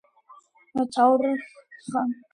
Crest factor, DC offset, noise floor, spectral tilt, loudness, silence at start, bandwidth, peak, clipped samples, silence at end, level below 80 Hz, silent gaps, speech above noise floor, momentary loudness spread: 18 dB; under 0.1%; -54 dBFS; -5.5 dB/octave; -24 LUFS; 0.3 s; 10.5 kHz; -8 dBFS; under 0.1%; 0.2 s; -74 dBFS; none; 31 dB; 18 LU